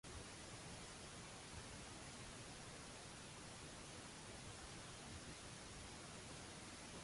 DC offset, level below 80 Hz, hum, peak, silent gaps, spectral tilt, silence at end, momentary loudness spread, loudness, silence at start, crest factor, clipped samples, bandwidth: under 0.1%; -66 dBFS; none; -42 dBFS; none; -3 dB/octave; 0 s; 1 LU; -54 LUFS; 0.05 s; 14 dB; under 0.1%; 11.5 kHz